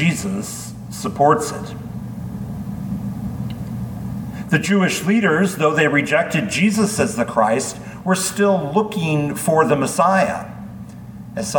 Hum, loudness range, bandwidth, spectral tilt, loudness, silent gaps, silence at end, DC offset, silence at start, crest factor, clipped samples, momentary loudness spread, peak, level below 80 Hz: none; 6 LU; 19 kHz; -5 dB/octave; -19 LUFS; none; 0 s; under 0.1%; 0 s; 18 dB; under 0.1%; 14 LU; -2 dBFS; -46 dBFS